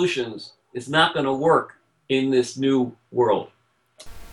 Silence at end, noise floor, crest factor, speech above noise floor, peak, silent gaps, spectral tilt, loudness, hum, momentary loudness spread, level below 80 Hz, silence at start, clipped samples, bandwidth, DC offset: 0 s; -52 dBFS; 20 dB; 30 dB; -4 dBFS; none; -5 dB/octave; -22 LUFS; none; 17 LU; -56 dBFS; 0 s; under 0.1%; 12 kHz; under 0.1%